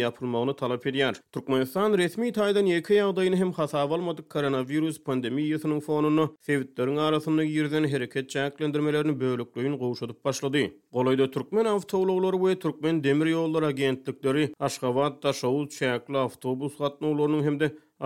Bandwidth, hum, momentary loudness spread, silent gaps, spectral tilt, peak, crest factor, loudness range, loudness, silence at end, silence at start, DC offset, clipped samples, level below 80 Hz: 16.5 kHz; none; 6 LU; none; -6 dB/octave; -10 dBFS; 16 dB; 2 LU; -27 LUFS; 0 s; 0 s; under 0.1%; under 0.1%; -72 dBFS